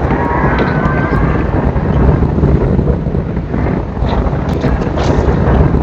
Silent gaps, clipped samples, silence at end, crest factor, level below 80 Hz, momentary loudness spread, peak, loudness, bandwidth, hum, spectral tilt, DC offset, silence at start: none; 0.2%; 0 s; 12 dB; -18 dBFS; 5 LU; 0 dBFS; -13 LUFS; 7.2 kHz; none; -9 dB/octave; under 0.1%; 0 s